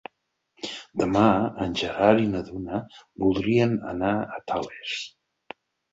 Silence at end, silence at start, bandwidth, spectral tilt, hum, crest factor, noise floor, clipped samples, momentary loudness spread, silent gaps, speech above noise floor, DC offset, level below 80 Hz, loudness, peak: 0.85 s; 0.65 s; 8 kHz; -6.5 dB/octave; none; 22 dB; -75 dBFS; under 0.1%; 23 LU; none; 51 dB; under 0.1%; -52 dBFS; -25 LUFS; -2 dBFS